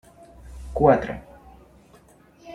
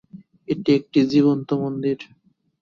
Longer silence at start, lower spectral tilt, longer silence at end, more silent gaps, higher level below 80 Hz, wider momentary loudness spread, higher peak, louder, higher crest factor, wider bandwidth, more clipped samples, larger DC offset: first, 0.45 s vs 0.15 s; about the same, -8.5 dB/octave vs -8 dB/octave; second, 0 s vs 0.55 s; neither; first, -42 dBFS vs -62 dBFS; first, 24 LU vs 10 LU; about the same, -4 dBFS vs -6 dBFS; about the same, -21 LUFS vs -21 LUFS; first, 22 dB vs 16 dB; first, 11.5 kHz vs 7 kHz; neither; neither